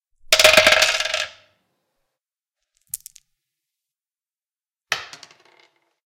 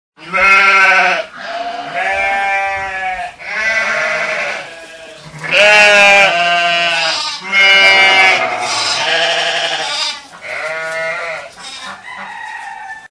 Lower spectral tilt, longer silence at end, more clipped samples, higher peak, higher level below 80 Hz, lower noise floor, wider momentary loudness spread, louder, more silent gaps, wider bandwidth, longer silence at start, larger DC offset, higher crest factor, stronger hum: about the same, 0.5 dB/octave vs -0.5 dB/octave; first, 1 s vs 0.05 s; second, under 0.1% vs 0.5%; about the same, -2 dBFS vs 0 dBFS; about the same, -54 dBFS vs -52 dBFS; first, under -90 dBFS vs -33 dBFS; about the same, 22 LU vs 21 LU; second, -15 LUFS vs -10 LUFS; neither; first, 17 kHz vs 11 kHz; about the same, 0.3 s vs 0.2 s; neither; first, 22 dB vs 14 dB; neither